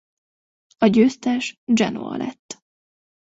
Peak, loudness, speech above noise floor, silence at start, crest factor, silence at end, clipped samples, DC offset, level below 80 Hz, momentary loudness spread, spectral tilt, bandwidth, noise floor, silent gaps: -4 dBFS; -20 LUFS; over 70 dB; 0.8 s; 20 dB; 0.7 s; under 0.1%; under 0.1%; -62 dBFS; 22 LU; -5.5 dB/octave; 8 kHz; under -90 dBFS; 1.58-1.67 s, 2.39-2.49 s